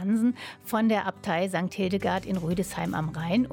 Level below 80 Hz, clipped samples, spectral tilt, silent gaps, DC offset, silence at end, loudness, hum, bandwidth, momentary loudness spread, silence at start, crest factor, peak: -54 dBFS; under 0.1%; -6 dB/octave; none; under 0.1%; 0 s; -28 LUFS; none; 17.5 kHz; 5 LU; 0 s; 14 dB; -14 dBFS